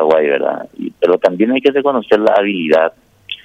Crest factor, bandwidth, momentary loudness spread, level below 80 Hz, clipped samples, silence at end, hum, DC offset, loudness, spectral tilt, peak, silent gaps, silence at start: 14 dB; 8 kHz; 8 LU; -60 dBFS; under 0.1%; 0.1 s; none; under 0.1%; -14 LUFS; -6.5 dB/octave; 0 dBFS; none; 0 s